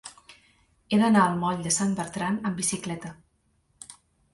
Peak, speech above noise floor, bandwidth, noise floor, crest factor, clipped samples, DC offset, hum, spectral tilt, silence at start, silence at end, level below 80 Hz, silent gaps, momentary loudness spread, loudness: -8 dBFS; 44 dB; 11.5 kHz; -69 dBFS; 20 dB; under 0.1%; under 0.1%; none; -4.5 dB/octave; 0.05 s; 0.4 s; -62 dBFS; none; 25 LU; -25 LUFS